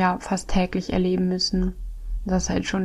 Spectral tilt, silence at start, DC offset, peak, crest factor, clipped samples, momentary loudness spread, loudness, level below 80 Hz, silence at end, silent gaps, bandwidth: -5 dB/octave; 0 s; under 0.1%; -8 dBFS; 14 dB; under 0.1%; 10 LU; -24 LUFS; -34 dBFS; 0 s; none; 11.5 kHz